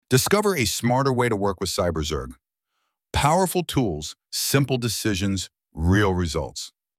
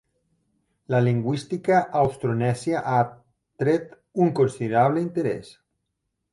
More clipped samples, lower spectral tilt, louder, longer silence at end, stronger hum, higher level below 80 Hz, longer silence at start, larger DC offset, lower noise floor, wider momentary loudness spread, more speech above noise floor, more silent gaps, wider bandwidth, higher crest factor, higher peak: neither; second, -4.5 dB/octave vs -7.5 dB/octave; about the same, -23 LUFS vs -23 LUFS; second, 0.3 s vs 0.8 s; neither; first, -40 dBFS vs -60 dBFS; second, 0.1 s vs 0.9 s; neither; about the same, -77 dBFS vs -79 dBFS; first, 10 LU vs 6 LU; about the same, 55 dB vs 56 dB; neither; first, 16.5 kHz vs 11.5 kHz; about the same, 18 dB vs 16 dB; first, -4 dBFS vs -8 dBFS